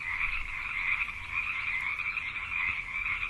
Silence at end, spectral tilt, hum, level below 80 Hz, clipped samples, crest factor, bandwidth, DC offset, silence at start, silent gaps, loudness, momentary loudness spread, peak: 0 s; -2.5 dB/octave; none; -48 dBFS; under 0.1%; 16 dB; 13 kHz; under 0.1%; 0 s; none; -31 LUFS; 3 LU; -16 dBFS